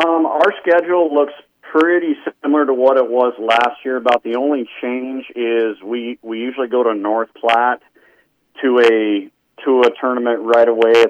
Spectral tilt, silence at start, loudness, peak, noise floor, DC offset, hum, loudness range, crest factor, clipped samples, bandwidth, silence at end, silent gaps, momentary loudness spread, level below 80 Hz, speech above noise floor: -4.5 dB/octave; 0 s; -16 LUFS; -2 dBFS; -56 dBFS; under 0.1%; none; 4 LU; 14 dB; under 0.1%; 9 kHz; 0 s; none; 10 LU; -74 dBFS; 41 dB